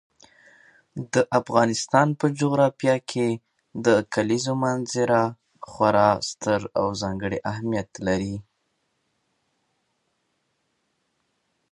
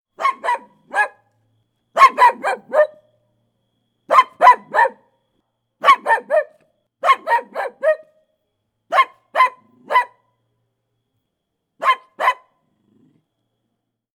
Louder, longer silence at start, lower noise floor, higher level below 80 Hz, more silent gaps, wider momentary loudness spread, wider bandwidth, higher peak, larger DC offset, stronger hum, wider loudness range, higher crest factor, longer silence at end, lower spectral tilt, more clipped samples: second, -23 LUFS vs -17 LUFS; first, 0.95 s vs 0.2 s; about the same, -73 dBFS vs -76 dBFS; first, -56 dBFS vs -68 dBFS; neither; about the same, 10 LU vs 12 LU; second, 11 kHz vs 16.5 kHz; about the same, -2 dBFS vs 0 dBFS; neither; neither; about the same, 10 LU vs 9 LU; about the same, 22 dB vs 20 dB; first, 3.3 s vs 1.8 s; first, -5.5 dB/octave vs -1 dB/octave; neither